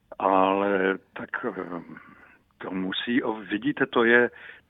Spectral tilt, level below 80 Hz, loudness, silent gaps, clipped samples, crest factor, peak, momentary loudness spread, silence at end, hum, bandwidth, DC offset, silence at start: -8 dB/octave; -66 dBFS; -25 LUFS; none; under 0.1%; 20 dB; -6 dBFS; 16 LU; 0.15 s; none; 4 kHz; under 0.1%; 0.1 s